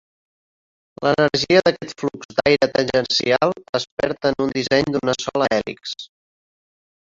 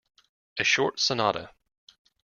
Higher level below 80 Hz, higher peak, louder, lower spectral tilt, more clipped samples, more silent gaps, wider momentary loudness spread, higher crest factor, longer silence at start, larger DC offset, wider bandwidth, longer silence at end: first, -54 dBFS vs -66 dBFS; first, -2 dBFS vs -8 dBFS; first, -19 LUFS vs -25 LUFS; first, -4.5 dB/octave vs -2.5 dB/octave; neither; first, 2.25-2.29 s, 3.69-3.73 s, 3.92-3.97 s vs none; about the same, 11 LU vs 11 LU; about the same, 20 dB vs 22 dB; first, 1 s vs 0.55 s; neither; about the same, 7.8 kHz vs 7.4 kHz; about the same, 1 s vs 0.9 s